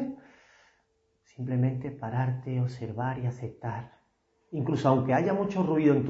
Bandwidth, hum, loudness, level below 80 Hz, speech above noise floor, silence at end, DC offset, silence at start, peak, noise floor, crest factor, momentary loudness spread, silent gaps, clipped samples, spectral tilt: 7.6 kHz; none; -29 LUFS; -64 dBFS; 44 dB; 0 s; under 0.1%; 0 s; -10 dBFS; -72 dBFS; 20 dB; 14 LU; none; under 0.1%; -9 dB/octave